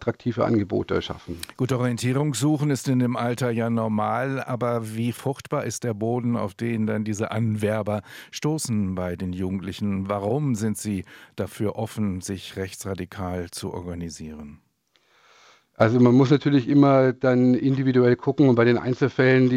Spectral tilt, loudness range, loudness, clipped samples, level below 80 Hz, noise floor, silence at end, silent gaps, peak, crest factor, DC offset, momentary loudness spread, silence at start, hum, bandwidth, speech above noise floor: -6.5 dB/octave; 11 LU; -23 LUFS; under 0.1%; -60 dBFS; -66 dBFS; 0 s; none; -2 dBFS; 20 dB; under 0.1%; 14 LU; 0 s; none; 15.5 kHz; 43 dB